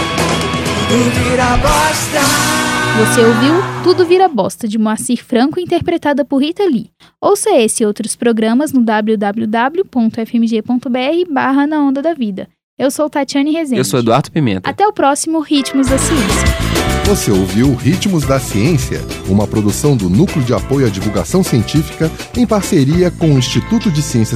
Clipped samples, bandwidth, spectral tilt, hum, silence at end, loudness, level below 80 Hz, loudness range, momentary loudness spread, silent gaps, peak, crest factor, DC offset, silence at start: under 0.1%; 16 kHz; -5 dB/octave; none; 0 s; -13 LUFS; -30 dBFS; 3 LU; 5 LU; 12.64-12.77 s; 0 dBFS; 12 dB; under 0.1%; 0 s